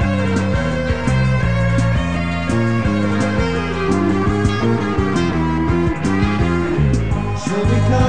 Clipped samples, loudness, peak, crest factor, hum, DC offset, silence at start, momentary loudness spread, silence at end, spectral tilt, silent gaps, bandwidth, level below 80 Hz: under 0.1%; -17 LUFS; -2 dBFS; 14 dB; none; 3%; 0 s; 3 LU; 0 s; -7 dB/octave; none; 10 kHz; -28 dBFS